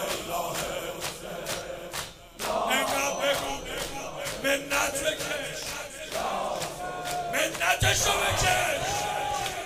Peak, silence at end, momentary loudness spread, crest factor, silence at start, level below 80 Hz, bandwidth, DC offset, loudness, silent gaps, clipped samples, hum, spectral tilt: -10 dBFS; 0 s; 11 LU; 20 dB; 0 s; -48 dBFS; 16 kHz; under 0.1%; -28 LUFS; none; under 0.1%; none; -2 dB/octave